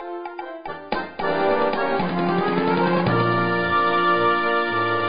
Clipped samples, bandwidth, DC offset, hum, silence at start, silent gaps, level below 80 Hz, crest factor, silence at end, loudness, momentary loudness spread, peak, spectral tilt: under 0.1%; 5.2 kHz; 1%; none; 0 s; none; -52 dBFS; 12 dB; 0 s; -21 LUFS; 14 LU; -8 dBFS; -11 dB/octave